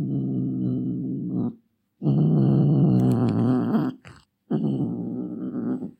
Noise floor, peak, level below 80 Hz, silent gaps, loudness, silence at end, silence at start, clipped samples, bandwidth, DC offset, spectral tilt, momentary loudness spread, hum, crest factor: -54 dBFS; -10 dBFS; -58 dBFS; none; -24 LUFS; 0.1 s; 0 s; under 0.1%; 8.2 kHz; under 0.1%; -10.5 dB/octave; 11 LU; none; 14 dB